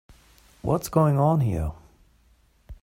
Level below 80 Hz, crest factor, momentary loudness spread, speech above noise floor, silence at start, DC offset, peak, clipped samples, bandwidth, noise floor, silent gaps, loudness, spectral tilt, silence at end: -44 dBFS; 18 dB; 13 LU; 39 dB; 0.65 s; under 0.1%; -8 dBFS; under 0.1%; 16 kHz; -61 dBFS; none; -24 LUFS; -8 dB/octave; 0.1 s